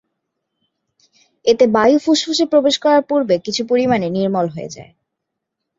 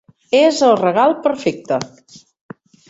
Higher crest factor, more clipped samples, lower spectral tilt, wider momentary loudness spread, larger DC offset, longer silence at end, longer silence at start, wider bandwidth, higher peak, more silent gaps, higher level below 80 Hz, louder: about the same, 16 dB vs 16 dB; neither; about the same, -4.5 dB/octave vs -4.5 dB/octave; about the same, 9 LU vs 10 LU; neither; about the same, 0.95 s vs 1.05 s; first, 1.45 s vs 0.3 s; about the same, 7.8 kHz vs 8 kHz; about the same, -2 dBFS vs -2 dBFS; neither; about the same, -60 dBFS vs -62 dBFS; about the same, -15 LUFS vs -15 LUFS